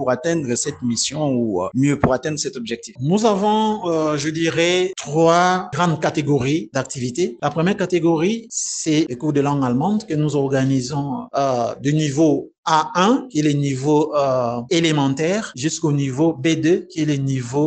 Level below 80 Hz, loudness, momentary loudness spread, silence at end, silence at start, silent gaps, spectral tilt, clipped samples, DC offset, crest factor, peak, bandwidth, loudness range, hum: -52 dBFS; -19 LUFS; 5 LU; 0 s; 0 s; 12.58-12.63 s; -5 dB/octave; under 0.1%; under 0.1%; 18 dB; 0 dBFS; 9.2 kHz; 2 LU; none